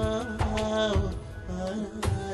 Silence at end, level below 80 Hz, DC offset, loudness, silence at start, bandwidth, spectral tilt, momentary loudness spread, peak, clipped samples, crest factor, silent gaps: 0 s; -36 dBFS; under 0.1%; -30 LUFS; 0 s; 12.5 kHz; -6 dB/octave; 9 LU; -14 dBFS; under 0.1%; 14 dB; none